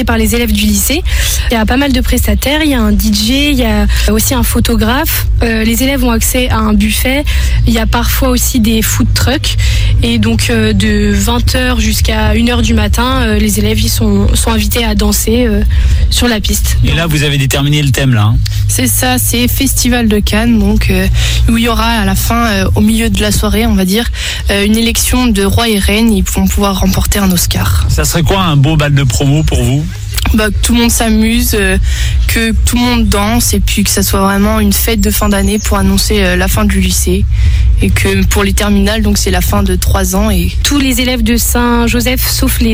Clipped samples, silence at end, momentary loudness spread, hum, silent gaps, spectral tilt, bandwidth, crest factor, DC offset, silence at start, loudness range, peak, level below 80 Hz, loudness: under 0.1%; 0 s; 2 LU; none; none; -4.5 dB/octave; 17 kHz; 10 dB; under 0.1%; 0 s; 1 LU; 0 dBFS; -14 dBFS; -10 LUFS